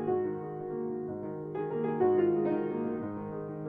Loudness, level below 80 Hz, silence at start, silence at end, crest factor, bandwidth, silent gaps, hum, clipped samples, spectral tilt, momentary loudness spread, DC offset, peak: -32 LUFS; -70 dBFS; 0 s; 0 s; 16 dB; 3.6 kHz; none; none; under 0.1%; -11.5 dB/octave; 11 LU; under 0.1%; -16 dBFS